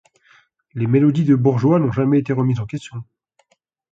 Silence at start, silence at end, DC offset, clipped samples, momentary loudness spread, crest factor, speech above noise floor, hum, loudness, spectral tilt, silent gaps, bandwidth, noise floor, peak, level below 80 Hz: 0.75 s; 0.9 s; under 0.1%; under 0.1%; 17 LU; 16 dB; 49 dB; none; -17 LUFS; -9.5 dB/octave; none; 7.8 kHz; -65 dBFS; -4 dBFS; -54 dBFS